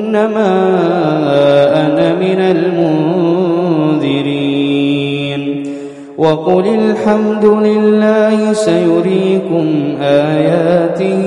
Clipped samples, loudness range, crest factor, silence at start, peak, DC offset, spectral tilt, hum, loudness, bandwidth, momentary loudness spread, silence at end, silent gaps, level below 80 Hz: under 0.1%; 3 LU; 12 dB; 0 s; 0 dBFS; under 0.1%; -7 dB/octave; none; -12 LUFS; 11.5 kHz; 5 LU; 0 s; none; -56 dBFS